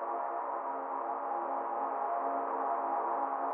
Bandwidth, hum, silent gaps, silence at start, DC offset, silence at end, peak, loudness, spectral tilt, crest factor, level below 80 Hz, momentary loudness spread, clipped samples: 3.4 kHz; none; none; 0 s; under 0.1%; 0 s; -22 dBFS; -35 LUFS; 4.5 dB/octave; 14 dB; under -90 dBFS; 3 LU; under 0.1%